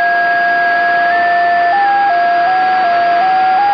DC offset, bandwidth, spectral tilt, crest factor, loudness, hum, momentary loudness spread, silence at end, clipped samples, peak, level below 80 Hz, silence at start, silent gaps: under 0.1%; 6 kHz; -4.5 dB/octave; 8 dB; -11 LUFS; none; 1 LU; 0 s; under 0.1%; -2 dBFS; -56 dBFS; 0 s; none